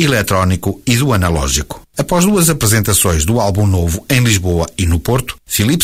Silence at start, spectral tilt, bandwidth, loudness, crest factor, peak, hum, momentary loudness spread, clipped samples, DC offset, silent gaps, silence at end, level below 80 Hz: 0 s; -4.5 dB/octave; 16.5 kHz; -14 LUFS; 12 dB; 0 dBFS; none; 7 LU; under 0.1%; under 0.1%; none; 0 s; -26 dBFS